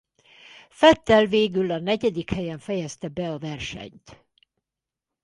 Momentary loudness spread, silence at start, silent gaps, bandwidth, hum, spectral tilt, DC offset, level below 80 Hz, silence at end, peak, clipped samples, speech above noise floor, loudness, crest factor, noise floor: 15 LU; 0.8 s; none; 11.5 kHz; none; -5.5 dB/octave; under 0.1%; -52 dBFS; 1.1 s; -2 dBFS; under 0.1%; 65 dB; -23 LUFS; 22 dB; -88 dBFS